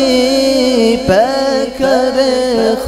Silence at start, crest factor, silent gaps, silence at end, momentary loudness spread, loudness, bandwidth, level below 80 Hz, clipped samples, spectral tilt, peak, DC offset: 0 s; 12 dB; none; 0 s; 3 LU; -12 LUFS; 15.5 kHz; -38 dBFS; under 0.1%; -4 dB/octave; 0 dBFS; under 0.1%